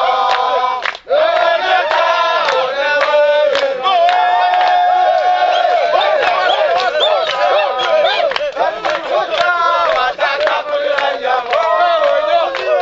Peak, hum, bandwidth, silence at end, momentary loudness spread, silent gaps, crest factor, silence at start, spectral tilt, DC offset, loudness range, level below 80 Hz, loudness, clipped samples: 0 dBFS; none; 7.8 kHz; 0 s; 5 LU; none; 14 dB; 0 s; -1.5 dB/octave; under 0.1%; 2 LU; -56 dBFS; -13 LUFS; under 0.1%